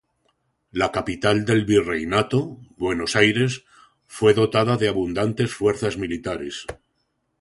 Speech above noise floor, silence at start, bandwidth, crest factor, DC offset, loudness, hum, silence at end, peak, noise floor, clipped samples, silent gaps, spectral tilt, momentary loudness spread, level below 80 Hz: 51 dB; 0.75 s; 11.5 kHz; 20 dB; under 0.1%; -21 LUFS; none; 0.65 s; -2 dBFS; -72 dBFS; under 0.1%; none; -5.5 dB/octave; 14 LU; -50 dBFS